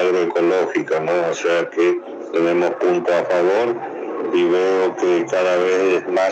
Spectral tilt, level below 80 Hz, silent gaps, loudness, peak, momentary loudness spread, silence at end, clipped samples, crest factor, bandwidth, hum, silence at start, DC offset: -5 dB/octave; -74 dBFS; none; -18 LUFS; -6 dBFS; 5 LU; 0 s; under 0.1%; 12 dB; 8.2 kHz; none; 0 s; under 0.1%